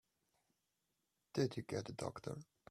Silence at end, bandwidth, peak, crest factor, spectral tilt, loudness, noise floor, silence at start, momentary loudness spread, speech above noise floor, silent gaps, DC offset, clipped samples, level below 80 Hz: 0.25 s; 14.5 kHz; -22 dBFS; 24 dB; -6 dB/octave; -44 LUFS; -87 dBFS; 1.35 s; 10 LU; 44 dB; none; under 0.1%; under 0.1%; -78 dBFS